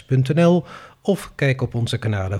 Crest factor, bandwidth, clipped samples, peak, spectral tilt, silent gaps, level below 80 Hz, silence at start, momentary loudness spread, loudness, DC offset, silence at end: 14 dB; 13.5 kHz; under 0.1%; -6 dBFS; -7 dB/octave; none; -50 dBFS; 0.1 s; 8 LU; -20 LUFS; under 0.1%; 0 s